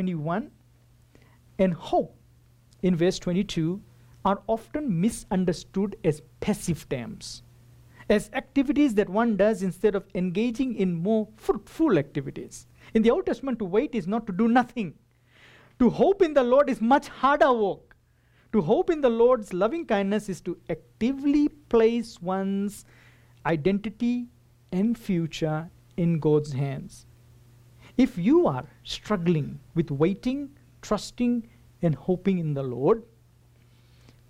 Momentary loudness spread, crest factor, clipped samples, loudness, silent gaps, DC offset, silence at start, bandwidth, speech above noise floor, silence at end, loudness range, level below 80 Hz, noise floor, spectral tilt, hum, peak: 12 LU; 16 dB; under 0.1%; -26 LUFS; none; under 0.1%; 0 s; 15.5 kHz; 37 dB; 1.25 s; 5 LU; -52 dBFS; -61 dBFS; -7 dB/octave; none; -10 dBFS